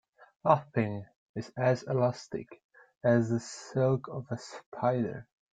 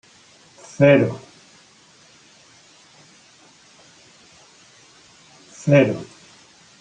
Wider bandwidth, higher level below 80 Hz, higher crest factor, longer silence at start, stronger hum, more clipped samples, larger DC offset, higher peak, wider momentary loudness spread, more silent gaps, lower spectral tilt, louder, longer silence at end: about the same, 9.2 kHz vs 9.4 kHz; about the same, -68 dBFS vs -64 dBFS; about the same, 22 dB vs 22 dB; second, 0.45 s vs 0.8 s; neither; neither; neither; second, -10 dBFS vs -2 dBFS; second, 15 LU vs 25 LU; first, 1.16-1.34 s, 2.64-2.69 s, 2.97-3.01 s, 4.66-4.72 s vs none; about the same, -7 dB/octave vs -7 dB/octave; second, -31 LUFS vs -18 LUFS; second, 0.3 s vs 0.75 s